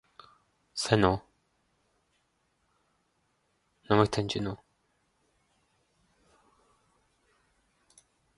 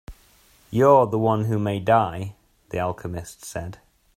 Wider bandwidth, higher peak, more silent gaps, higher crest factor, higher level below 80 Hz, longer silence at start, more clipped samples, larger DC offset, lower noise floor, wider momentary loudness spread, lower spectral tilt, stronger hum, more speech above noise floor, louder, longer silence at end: second, 11.5 kHz vs 15.5 kHz; second, -6 dBFS vs -2 dBFS; neither; first, 28 dB vs 20 dB; about the same, -56 dBFS vs -52 dBFS; first, 0.75 s vs 0.1 s; neither; neither; first, -75 dBFS vs -56 dBFS; second, 13 LU vs 18 LU; second, -5.5 dB/octave vs -7 dB/octave; neither; first, 48 dB vs 35 dB; second, -29 LUFS vs -21 LUFS; first, 3.8 s vs 0.4 s